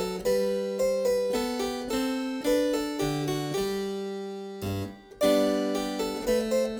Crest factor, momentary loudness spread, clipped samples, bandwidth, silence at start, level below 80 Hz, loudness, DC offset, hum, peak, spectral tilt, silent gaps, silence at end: 16 dB; 9 LU; under 0.1%; over 20 kHz; 0 s; -54 dBFS; -28 LUFS; under 0.1%; none; -12 dBFS; -5 dB/octave; none; 0 s